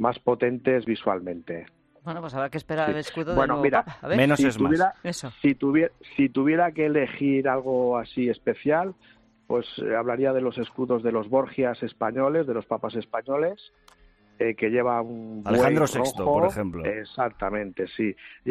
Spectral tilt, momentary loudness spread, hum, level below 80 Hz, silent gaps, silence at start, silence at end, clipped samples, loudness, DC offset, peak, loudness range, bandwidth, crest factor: -6.5 dB/octave; 9 LU; none; -54 dBFS; none; 0 s; 0 s; under 0.1%; -25 LUFS; under 0.1%; -6 dBFS; 4 LU; 13.5 kHz; 18 dB